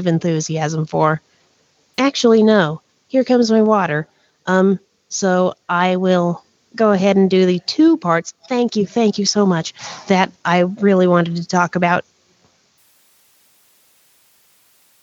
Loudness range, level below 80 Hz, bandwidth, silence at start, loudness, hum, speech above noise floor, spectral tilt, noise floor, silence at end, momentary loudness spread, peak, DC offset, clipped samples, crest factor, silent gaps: 3 LU; -64 dBFS; 7.8 kHz; 0 s; -16 LUFS; none; 44 dB; -5.5 dB/octave; -59 dBFS; 3 s; 10 LU; -2 dBFS; under 0.1%; under 0.1%; 16 dB; none